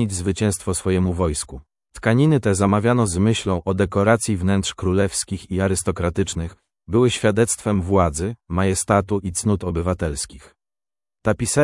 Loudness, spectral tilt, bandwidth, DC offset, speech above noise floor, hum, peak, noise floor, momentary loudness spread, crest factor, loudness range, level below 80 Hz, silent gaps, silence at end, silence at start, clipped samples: -20 LUFS; -5.5 dB/octave; 12 kHz; under 0.1%; over 70 dB; none; -2 dBFS; under -90 dBFS; 8 LU; 20 dB; 3 LU; -42 dBFS; none; 0 s; 0 s; under 0.1%